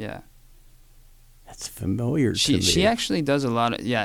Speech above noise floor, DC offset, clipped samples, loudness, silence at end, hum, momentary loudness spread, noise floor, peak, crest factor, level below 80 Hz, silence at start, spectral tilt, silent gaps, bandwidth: 28 dB; under 0.1%; under 0.1%; -22 LUFS; 0 s; none; 17 LU; -51 dBFS; -6 dBFS; 18 dB; -46 dBFS; 0 s; -4 dB/octave; none; 19 kHz